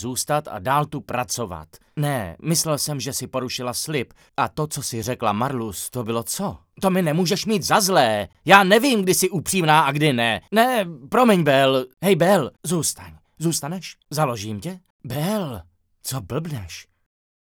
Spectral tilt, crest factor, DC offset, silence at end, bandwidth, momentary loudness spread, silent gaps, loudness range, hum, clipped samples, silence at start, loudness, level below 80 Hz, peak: -4 dB/octave; 22 dB; under 0.1%; 0.7 s; over 20 kHz; 15 LU; 14.90-14.99 s; 10 LU; none; under 0.1%; 0 s; -21 LUFS; -56 dBFS; 0 dBFS